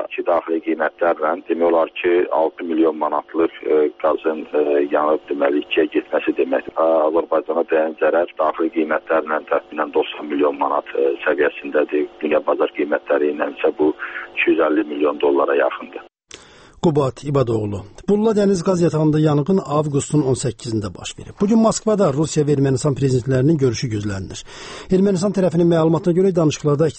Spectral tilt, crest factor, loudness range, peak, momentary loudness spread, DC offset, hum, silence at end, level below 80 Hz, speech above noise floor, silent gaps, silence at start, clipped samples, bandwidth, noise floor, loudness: -6.5 dB/octave; 14 dB; 2 LU; -4 dBFS; 6 LU; under 0.1%; none; 0 s; -50 dBFS; 26 dB; none; 0 s; under 0.1%; 8.8 kHz; -44 dBFS; -19 LUFS